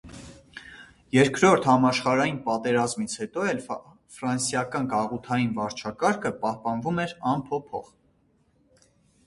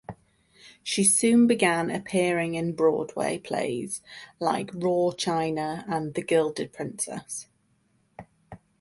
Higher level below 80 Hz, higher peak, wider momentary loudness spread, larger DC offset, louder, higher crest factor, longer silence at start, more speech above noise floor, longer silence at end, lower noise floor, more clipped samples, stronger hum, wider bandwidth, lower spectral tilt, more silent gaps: about the same, -60 dBFS vs -64 dBFS; about the same, -4 dBFS vs -6 dBFS; first, 18 LU vs 15 LU; neither; about the same, -25 LUFS vs -25 LUFS; about the same, 22 dB vs 20 dB; about the same, 0.05 s vs 0.1 s; about the same, 40 dB vs 42 dB; first, 1.45 s vs 0.25 s; about the same, -65 dBFS vs -68 dBFS; neither; neither; about the same, 11.5 kHz vs 12 kHz; about the same, -5 dB/octave vs -4 dB/octave; neither